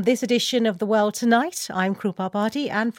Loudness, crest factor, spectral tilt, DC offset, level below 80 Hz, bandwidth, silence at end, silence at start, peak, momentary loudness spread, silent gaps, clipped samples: -22 LUFS; 16 dB; -4 dB/octave; under 0.1%; -70 dBFS; 17 kHz; 0.05 s; 0 s; -6 dBFS; 5 LU; none; under 0.1%